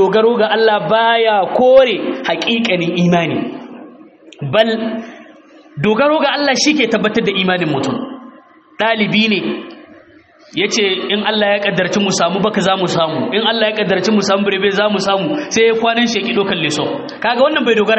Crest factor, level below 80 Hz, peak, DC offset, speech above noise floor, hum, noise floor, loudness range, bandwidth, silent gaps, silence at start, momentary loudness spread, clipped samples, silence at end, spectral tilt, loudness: 14 dB; -56 dBFS; 0 dBFS; under 0.1%; 31 dB; none; -45 dBFS; 4 LU; 8.2 kHz; none; 0 s; 9 LU; under 0.1%; 0 s; -4.5 dB/octave; -14 LUFS